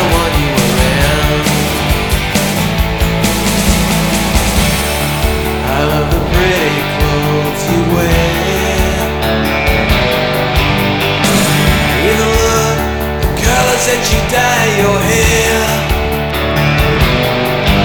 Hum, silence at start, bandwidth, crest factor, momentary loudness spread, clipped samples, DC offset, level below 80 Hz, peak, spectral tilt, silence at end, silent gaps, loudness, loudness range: none; 0 s; over 20 kHz; 12 dB; 4 LU; under 0.1%; under 0.1%; -20 dBFS; 0 dBFS; -4.5 dB/octave; 0 s; none; -12 LUFS; 2 LU